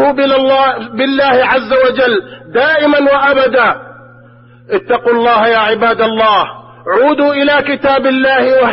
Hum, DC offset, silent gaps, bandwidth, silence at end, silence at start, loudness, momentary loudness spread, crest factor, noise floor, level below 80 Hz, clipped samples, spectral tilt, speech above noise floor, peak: none; under 0.1%; none; 5.8 kHz; 0 s; 0 s; -10 LUFS; 6 LU; 10 dB; -40 dBFS; -48 dBFS; under 0.1%; -9.5 dB/octave; 29 dB; 0 dBFS